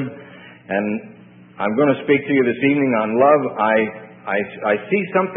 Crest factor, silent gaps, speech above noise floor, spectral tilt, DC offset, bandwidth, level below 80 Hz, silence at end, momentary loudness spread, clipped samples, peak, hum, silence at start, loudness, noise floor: 18 dB; none; 23 dB; -11.5 dB/octave; under 0.1%; 3.8 kHz; -66 dBFS; 0 s; 10 LU; under 0.1%; -2 dBFS; none; 0 s; -18 LUFS; -41 dBFS